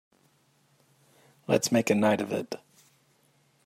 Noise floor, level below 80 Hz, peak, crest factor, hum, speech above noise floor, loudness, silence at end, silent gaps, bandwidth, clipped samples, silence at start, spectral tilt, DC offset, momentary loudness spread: -67 dBFS; -76 dBFS; -10 dBFS; 22 dB; none; 41 dB; -27 LUFS; 1.1 s; none; 16 kHz; under 0.1%; 1.5 s; -4.5 dB/octave; under 0.1%; 17 LU